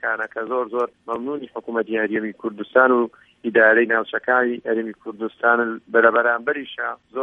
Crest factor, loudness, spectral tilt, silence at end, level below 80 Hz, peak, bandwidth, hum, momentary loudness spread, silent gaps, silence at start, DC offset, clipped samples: 20 dB; -20 LUFS; -7 dB/octave; 0 s; -70 dBFS; 0 dBFS; 3.9 kHz; none; 13 LU; none; 0.05 s; under 0.1%; under 0.1%